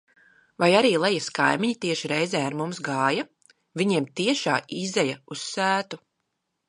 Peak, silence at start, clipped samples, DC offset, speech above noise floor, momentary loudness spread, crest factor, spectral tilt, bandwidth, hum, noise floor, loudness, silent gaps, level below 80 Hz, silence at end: -4 dBFS; 0.6 s; under 0.1%; under 0.1%; 54 dB; 11 LU; 20 dB; -4 dB/octave; 11.5 kHz; none; -78 dBFS; -24 LUFS; none; -76 dBFS; 0.7 s